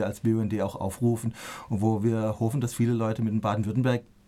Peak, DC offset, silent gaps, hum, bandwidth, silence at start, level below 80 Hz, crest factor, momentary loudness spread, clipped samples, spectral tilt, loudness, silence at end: -12 dBFS; under 0.1%; none; none; 14.5 kHz; 0 s; -56 dBFS; 14 dB; 5 LU; under 0.1%; -7.5 dB/octave; -27 LUFS; 0.25 s